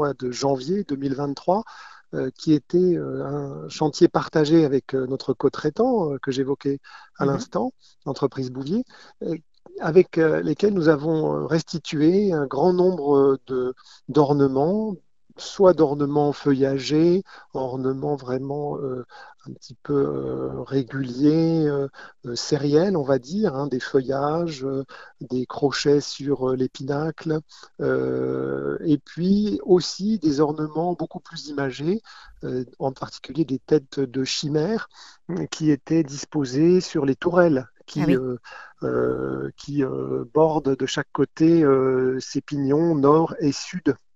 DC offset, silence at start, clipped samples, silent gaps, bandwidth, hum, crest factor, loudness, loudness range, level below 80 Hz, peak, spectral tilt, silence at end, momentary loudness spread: 0.1%; 0 s; under 0.1%; none; 8 kHz; none; 20 dB; -23 LUFS; 5 LU; -56 dBFS; -4 dBFS; -6.5 dB/octave; 0.2 s; 12 LU